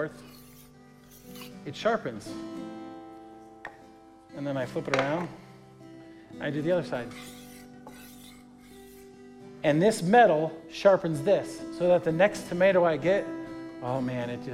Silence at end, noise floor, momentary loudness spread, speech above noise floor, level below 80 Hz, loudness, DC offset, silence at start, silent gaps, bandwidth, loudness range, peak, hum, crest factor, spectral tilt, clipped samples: 0 s; -53 dBFS; 25 LU; 27 dB; -64 dBFS; -27 LUFS; under 0.1%; 0 s; none; 16 kHz; 12 LU; -8 dBFS; none; 20 dB; -6 dB/octave; under 0.1%